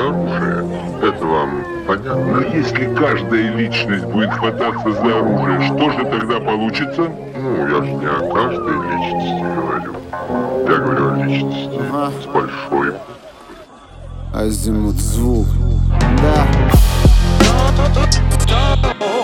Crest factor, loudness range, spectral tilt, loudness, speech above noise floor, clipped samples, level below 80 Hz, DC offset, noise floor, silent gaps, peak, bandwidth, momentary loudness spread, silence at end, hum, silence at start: 16 dB; 6 LU; -6 dB/octave; -16 LUFS; 22 dB; under 0.1%; -20 dBFS; under 0.1%; -38 dBFS; none; 0 dBFS; 16.5 kHz; 9 LU; 0 s; none; 0 s